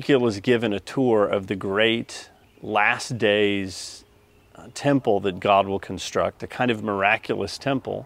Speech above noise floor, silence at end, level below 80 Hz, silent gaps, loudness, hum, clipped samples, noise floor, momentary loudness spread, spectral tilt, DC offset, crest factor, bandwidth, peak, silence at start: 33 dB; 0 s; -58 dBFS; none; -23 LUFS; none; under 0.1%; -56 dBFS; 9 LU; -5 dB/octave; under 0.1%; 20 dB; 15.5 kHz; -4 dBFS; 0 s